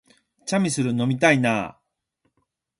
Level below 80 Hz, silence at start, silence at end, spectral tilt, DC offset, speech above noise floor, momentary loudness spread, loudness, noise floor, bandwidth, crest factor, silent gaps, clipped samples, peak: -62 dBFS; 0.45 s; 1.1 s; -5 dB/octave; under 0.1%; 53 dB; 13 LU; -21 LUFS; -74 dBFS; 11.5 kHz; 22 dB; none; under 0.1%; -4 dBFS